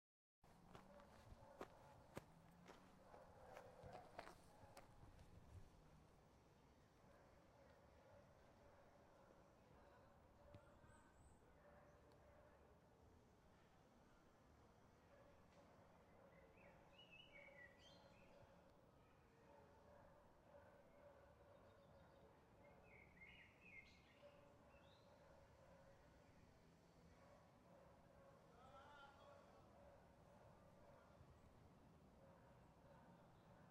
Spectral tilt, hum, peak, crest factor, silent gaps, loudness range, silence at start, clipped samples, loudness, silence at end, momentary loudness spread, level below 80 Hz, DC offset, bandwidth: -5.5 dB/octave; none; -36 dBFS; 34 dB; none; 4 LU; 0.4 s; under 0.1%; -66 LUFS; 0 s; 7 LU; -78 dBFS; under 0.1%; 10.5 kHz